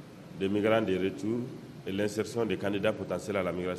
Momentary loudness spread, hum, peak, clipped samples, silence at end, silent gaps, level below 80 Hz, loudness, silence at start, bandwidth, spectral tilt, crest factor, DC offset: 10 LU; none; -12 dBFS; under 0.1%; 0 s; none; -68 dBFS; -31 LUFS; 0 s; 13.5 kHz; -6 dB/octave; 18 dB; under 0.1%